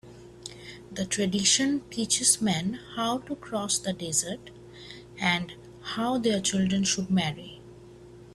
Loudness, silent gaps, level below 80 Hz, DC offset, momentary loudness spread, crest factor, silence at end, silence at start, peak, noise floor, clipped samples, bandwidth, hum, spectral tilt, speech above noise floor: -26 LUFS; none; -58 dBFS; under 0.1%; 22 LU; 22 dB; 0 s; 0.05 s; -8 dBFS; -48 dBFS; under 0.1%; 14.5 kHz; 60 Hz at -50 dBFS; -3 dB/octave; 21 dB